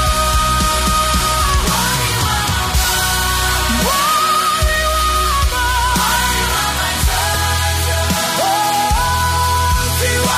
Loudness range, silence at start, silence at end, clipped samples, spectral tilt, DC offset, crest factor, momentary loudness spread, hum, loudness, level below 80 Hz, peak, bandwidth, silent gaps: 1 LU; 0 s; 0 s; under 0.1%; -2.5 dB/octave; under 0.1%; 12 dB; 2 LU; none; -14 LUFS; -22 dBFS; -2 dBFS; 15.5 kHz; none